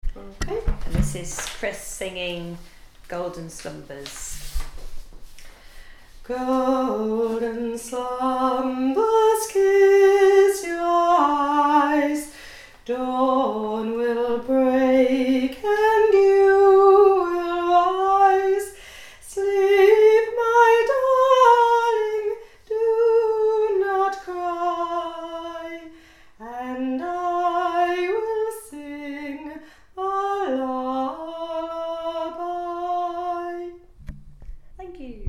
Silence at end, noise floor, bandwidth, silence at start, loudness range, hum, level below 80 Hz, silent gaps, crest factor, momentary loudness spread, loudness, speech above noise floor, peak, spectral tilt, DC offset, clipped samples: 0 s; -48 dBFS; 15 kHz; 0.05 s; 13 LU; none; -40 dBFS; none; 18 dB; 20 LU; -20 LUFS; 24 dB; -2 dBFS; -5 dB/octave; under 0.1%; under 0.1%